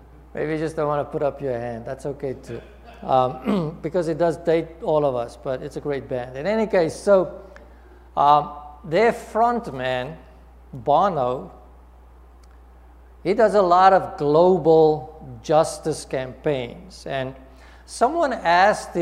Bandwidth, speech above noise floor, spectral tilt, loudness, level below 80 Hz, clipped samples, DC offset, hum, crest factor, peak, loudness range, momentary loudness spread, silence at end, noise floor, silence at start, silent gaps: 13 kHz; 26 dB; -6 dB/octave; -21 LUFS; -48 dBFS; under 0.1%; under 0.1%; none; 20 dB; -2 dBFS; 7 LU; 17 LU; 0 s; -47 dBFS; 0.35 s; none